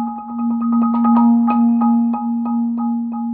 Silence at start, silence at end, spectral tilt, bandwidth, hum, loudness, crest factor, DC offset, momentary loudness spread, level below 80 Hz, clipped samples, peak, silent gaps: 0 s; 0 s; -9 dB/octave; 2.7 kHz; none; -16 LUFS; 12 dB; under 0.1%; 8 LU; -60 dBFS; under 0.1%; -4 dBFS; none